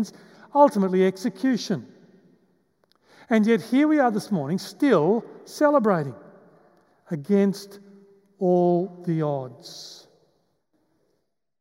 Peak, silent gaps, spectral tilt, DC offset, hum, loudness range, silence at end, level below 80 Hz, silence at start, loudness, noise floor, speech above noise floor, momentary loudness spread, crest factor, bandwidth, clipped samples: -4 dBFS; none; -7 dB/octave; under 0.1%; none; 5 LU; 1.65 s; -78 dBFS; 0 s; -23 LUFS; -75 dBFS; 53 dB; 17 LU; 20 dB; 16 kHz; under 0.1%